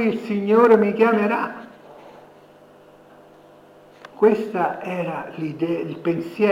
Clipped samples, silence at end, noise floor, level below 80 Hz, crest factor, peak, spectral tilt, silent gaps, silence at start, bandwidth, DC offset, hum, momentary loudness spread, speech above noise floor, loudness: under 0.1%; 0 s; -49 dBFS; -72 dBFS; 18 dB; -4 dBFS; -8 dB/octave; none; 0 s; 11 kHz; under 0.1%; 50 Hz at -55 dBFS; 13 LU; 29 dB; -20 LUFS